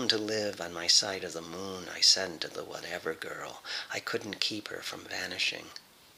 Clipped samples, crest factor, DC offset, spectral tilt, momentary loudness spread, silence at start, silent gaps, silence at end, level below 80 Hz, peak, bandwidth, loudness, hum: under 0.1%; 26 dB; under 0.1%; -1 dB/octave; 16 LU; 0 s; none; 0.35 s; -74 dBFS; -6 dBFS; 16.5 kHz; -30 LUFS; none